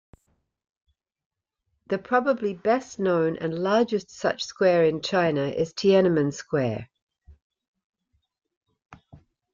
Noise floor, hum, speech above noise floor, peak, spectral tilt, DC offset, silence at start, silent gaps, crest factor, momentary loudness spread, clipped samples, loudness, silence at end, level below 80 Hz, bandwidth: -78 dBFS; none; 54 dB; -8 dBFS; -6 dB/octave; under 0.1%; 1.9 s; 7.02-7.07 s, 7.42-7.50 s, 7.68-7.74 s, 7.84-7.90 s, 8.57-8.61 s; 18 dB; 8 LU; under 0.1%; -24 LUFS; 0.4 s; -64 dBFS; 7.6 kHz